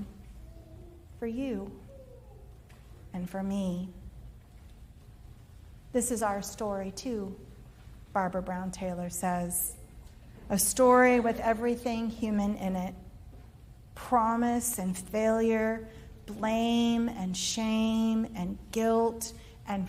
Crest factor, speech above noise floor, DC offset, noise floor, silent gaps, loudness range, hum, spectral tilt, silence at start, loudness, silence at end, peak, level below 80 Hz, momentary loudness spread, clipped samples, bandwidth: 20 dB; 22 dB; under 0.1%; -51 dBFS; none; 12 LU; none; -4.5 dB/octave; 0 s; -30 LUFS; 0 s; -12 dBFS; -52 dBFS; 22 LU; under 0.1%; 16 kHz